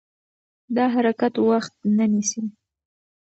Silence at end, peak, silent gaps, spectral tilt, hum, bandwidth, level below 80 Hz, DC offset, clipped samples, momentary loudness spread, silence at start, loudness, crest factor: 0.7 s; -8 dBFS; none; -5 dB/octave; none; 8.2 kHz; -74 dBFS; under 0.1%; under 0.1%; 8 LU; 0.7 s; -22 LUFS; 16 dB